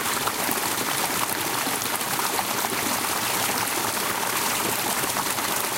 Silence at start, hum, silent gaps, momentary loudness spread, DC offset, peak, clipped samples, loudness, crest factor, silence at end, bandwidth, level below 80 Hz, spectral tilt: 0 s; none; none; 1 LU; under 0.1%; -8 dBFS; under 0.1%; -23 LUFS; 18 dB; 0 s; 17 kHz; -58 dBFS; -1 dB/octave